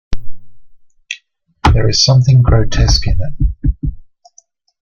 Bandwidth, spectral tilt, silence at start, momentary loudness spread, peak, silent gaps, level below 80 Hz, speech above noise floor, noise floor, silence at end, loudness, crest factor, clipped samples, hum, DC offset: 7.4 kHz; -5 dB/octave; 0.1 s; 18 LU; 0 dBFS; none; -20 dBFS; 41 dB; -51 dBFS; 0.8 s; -13 LUFS; 14 dB; under 0.1%; none; under 0.1%